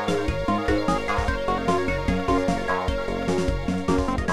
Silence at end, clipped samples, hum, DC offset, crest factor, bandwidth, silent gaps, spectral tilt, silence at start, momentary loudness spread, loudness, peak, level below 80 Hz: 0 s; under 0.1%; none; 1%; 14 dB; 14.5 kHz; none; -6 dB/octave; 0 s; 2 LU; -24 LUFS; -8 dBFS; -32 dBFS